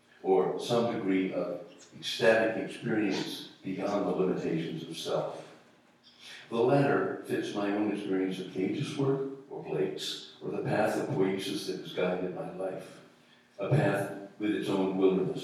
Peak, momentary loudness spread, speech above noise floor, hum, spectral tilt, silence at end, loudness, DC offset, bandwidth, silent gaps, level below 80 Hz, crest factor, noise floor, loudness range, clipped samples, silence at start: -10 dBFS; 12 LU; 30 dB; none; -6 dB/octave; 0 s; -31 LUFS; under 0.1%; 14 kHz; none; -78 dBFS; 22 dB; -61 dBFS; 3 LU; under 0.1%; 0.25 s